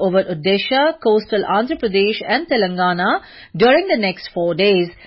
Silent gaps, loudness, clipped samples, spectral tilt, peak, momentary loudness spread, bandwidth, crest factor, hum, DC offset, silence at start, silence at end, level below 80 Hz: none; -17 LUFS; under 0.1%; -10 dB/octave; -4 dBFS; 6 LU; 5.8 kHz; 14 dB; none; under 0.1%; 0 s; 0.15 s; -52 dBFS